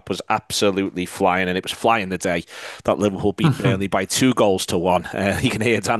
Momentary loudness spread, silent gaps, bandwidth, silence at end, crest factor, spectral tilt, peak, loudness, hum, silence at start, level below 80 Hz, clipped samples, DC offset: 5 LU; none; 12.5 kHz; 0 s; 16 dB; -4.5 dB/octave; -4 dBFS; -20 LUFS; none; 0.05 s; -52 dBFS; under 0.1%; under 0.1%